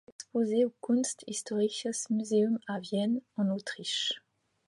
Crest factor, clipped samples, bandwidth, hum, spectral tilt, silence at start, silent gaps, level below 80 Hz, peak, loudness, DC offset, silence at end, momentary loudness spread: 16 dB; under 0.1%; 11.5 kHz; none; -4 dB/octave; 0.2 s; none; -78 dBFS; -16 dBFS; -31 LUFS; under 0.1%; 0.5 s; 6 LU